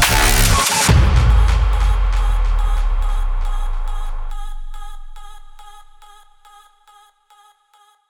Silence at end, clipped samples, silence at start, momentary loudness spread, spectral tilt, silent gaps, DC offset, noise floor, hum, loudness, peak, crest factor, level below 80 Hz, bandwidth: 2.3 s; under 0.1%; 0 s; 21 LU; -3.5 dB/octave; none; under 0.1%; -55 dBFS; none; -17 LUFS; 0 dBFS; 16 dB; -18 dBFS; over 20 kHz